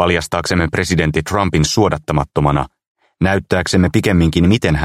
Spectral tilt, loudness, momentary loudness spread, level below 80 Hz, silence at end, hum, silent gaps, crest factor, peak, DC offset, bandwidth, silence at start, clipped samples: -5.5 dB/octave; -15 LUFS; 5 LU; -30 dBFS; 0 s; none; 2.87-2.95 s; 14 dB; 0 dBFS; under 0.1%; 15 kHz; 0 s; under 0.1%